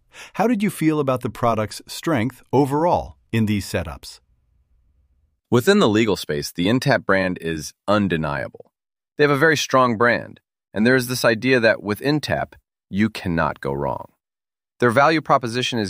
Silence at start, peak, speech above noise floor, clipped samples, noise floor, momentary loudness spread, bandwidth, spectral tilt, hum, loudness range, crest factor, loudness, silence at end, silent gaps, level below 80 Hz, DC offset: 0.15 s; -2 dBFS; over 70 dB; under 0.1%; under -90 dBFS; 12 LU; 16 kHz; -5.5 dB/octave; none; 5 LU; 18 dB; -20 LUFS; 0 s; none; -48 dBFS; under 0.1%